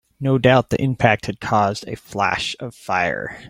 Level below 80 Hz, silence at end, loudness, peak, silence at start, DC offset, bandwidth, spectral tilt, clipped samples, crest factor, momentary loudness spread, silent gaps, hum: -48 dBFS; 0 s; -19 LUFS; -2 dBFS; 0.2 s; under 0.1%; 15.5 kHz; -6 dB/octave; under 0.1%; 18 dB; 11 LU; none; none